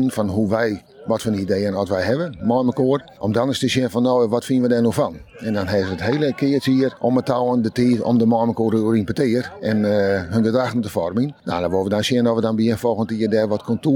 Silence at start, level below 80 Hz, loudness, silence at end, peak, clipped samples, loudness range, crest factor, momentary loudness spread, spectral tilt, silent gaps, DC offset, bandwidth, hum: 0 s; -52 dBFS; -20 LUFS; 0 s; -4 dBFS; under 0.1%; 2 LU; 14 dB; 5 LU; -6.5 dB/octave; none; under 0.1%; 18.5 kHz; none